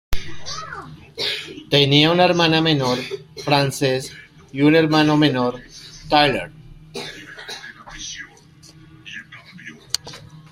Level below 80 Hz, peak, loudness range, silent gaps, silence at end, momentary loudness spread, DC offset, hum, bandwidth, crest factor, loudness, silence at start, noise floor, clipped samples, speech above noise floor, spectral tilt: -42 dBFS; -2 dBFS; 15 LU; none; 0.1 s; 22 LU; under 0.1%; none; 16 kHz; 20 dB; -18 LUFS; 0.1 s; -47 dBFS; under 0.1%; 30 dB; -5 dB/octave